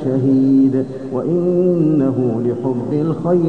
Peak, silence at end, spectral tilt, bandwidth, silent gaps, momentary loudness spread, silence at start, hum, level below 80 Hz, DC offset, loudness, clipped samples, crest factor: -4 dBFS; 0 s; -11 dB/octave; 4.5 kHz; none; 7 LU; 0 s; none; -56 dBFS; 0.5%; -16 LUFS; under 0.1%; 12 dB